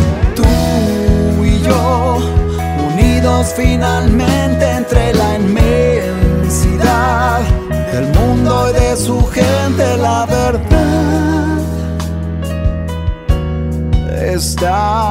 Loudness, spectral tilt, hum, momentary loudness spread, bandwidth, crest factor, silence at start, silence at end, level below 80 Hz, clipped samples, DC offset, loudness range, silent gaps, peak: -13 LUFS; -6 dB/octave; none; 6 LU; 16.5 kHz; 12 dB; 0 s; 0 s; -18 dBFS; under 0.1%; under 0.1%; 4 LU; none; 0 dBFS